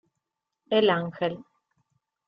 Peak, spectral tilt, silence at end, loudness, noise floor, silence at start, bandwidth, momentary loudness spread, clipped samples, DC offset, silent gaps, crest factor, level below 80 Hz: -10 dBFS; -8 dB/octave; 0.85 s; -25 LUFS; -84 dBFS; 0.7 s; 5.4 kHz; 10 LU; under 0.1%; under 0.1%; none; 20 dB; -72 dBFS